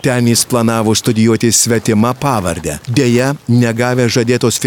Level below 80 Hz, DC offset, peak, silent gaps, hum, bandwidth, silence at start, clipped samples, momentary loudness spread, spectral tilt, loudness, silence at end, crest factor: -42 dBFS; under 0.1%; 0 dBFS; none; none; 18.5 kHz; 0.05 s; under 0.1%; 5 LU; -4.5 dB/octave; -12 LUFS; 0 s; 12 dB